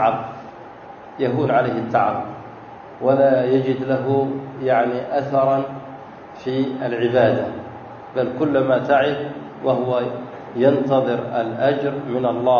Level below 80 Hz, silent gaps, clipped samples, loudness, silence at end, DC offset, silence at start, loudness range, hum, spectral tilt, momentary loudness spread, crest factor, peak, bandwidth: -60 dBFS; none; under 0.1%; -20 LUFS; 0 s; under 0.1%; 0 s; 2 LU; none; -8.5 dB/octave; 20 LU; 18 dB; -2 dBFS; 6.8 kHz